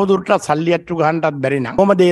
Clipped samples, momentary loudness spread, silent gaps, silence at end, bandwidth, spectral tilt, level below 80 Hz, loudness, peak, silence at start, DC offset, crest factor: under 0.1%; 4 LU; none; 0 s; 12 kHz; -6.5 dB/octave; -50 dBFS; -16 LUFS; 0 dBFS; 0 s; under 0.1%; 14 dB